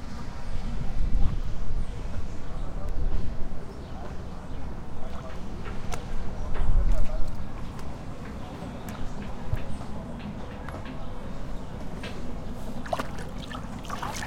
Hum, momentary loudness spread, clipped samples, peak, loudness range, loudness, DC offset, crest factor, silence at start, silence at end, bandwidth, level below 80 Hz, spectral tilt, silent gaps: none; 8 LU; under 0.1%; -8 dBFS; 3 LU; -36 LUFS; under 0.1%; 16 dB; 0 s; 0 s; 9.4 kHz; -30 dBFS; -6 dB/octave; none